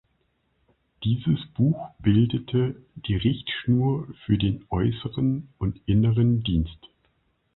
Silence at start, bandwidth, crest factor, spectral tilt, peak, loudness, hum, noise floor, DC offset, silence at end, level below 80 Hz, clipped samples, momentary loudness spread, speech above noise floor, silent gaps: 1 s; 4.1 kHz; 16 dB; -12 dB/octave; -8 dBFS; -25 LUFS; none; -70 dBFS; under 0.1%; 0.8 s; -42 dBFS; under 0.1%; 8 LU; 47 dB; none